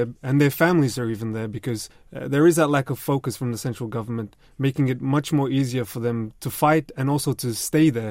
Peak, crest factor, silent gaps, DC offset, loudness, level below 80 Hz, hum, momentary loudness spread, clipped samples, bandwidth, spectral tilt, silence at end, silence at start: -6 dBFS; 18 dB; none; under 0.1%; -23 LUFS; -54 dBFS; none; 11 LU; under 0.1%; 16.5 kHz; -6 dB/octave; 0 s; 0 s